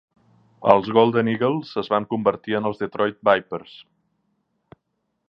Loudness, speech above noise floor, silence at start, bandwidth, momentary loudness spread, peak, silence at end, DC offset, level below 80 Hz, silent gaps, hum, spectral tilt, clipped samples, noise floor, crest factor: -21 LUFS; 54 dB; 0.6 s; 6 kHz; 9 LU; 0 dBFS; 1.45 s; under 0.1%; -62 dBFS; none; none; -8.5 dB/octave; under 0.1%; -75 dBFS; 22 dB